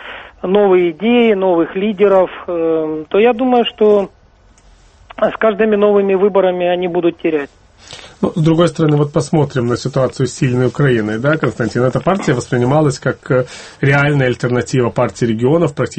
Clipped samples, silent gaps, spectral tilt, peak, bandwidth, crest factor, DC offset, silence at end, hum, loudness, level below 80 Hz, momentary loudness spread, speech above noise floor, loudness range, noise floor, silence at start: under 0.1%; none; -7 dB/octave; 0 dBFS; 8.8 kHz; 14 dB; under 0.1%; 0 s; none; -14 LUFS; -46 dBFS; 7 LU; 34 dB; 2 LU; -47 dBFS; 0 s